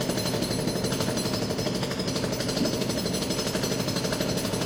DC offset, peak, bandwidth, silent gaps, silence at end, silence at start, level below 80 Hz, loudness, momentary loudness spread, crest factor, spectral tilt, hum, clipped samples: under 0.1%; -12 dBFS; 16.5 kHz; none; 0 s; 0 s; -48 dBFS; -27 LUFS; 2 LU; 14 dB; -4 dB/octave; none; under 0.1%